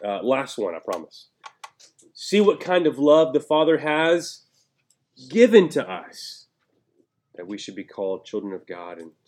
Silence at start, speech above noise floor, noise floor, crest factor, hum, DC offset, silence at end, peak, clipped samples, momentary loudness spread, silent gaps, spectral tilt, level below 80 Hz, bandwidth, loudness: 0 s; 49 dB; -70 dBFS; 22 dB; none; under 0.1%; 0.2 s; -2 dBFS; under 0.1%; 20 LU; none; -5 dB/octave; -82 dBFS; 13.5 kHz; -21 LUFS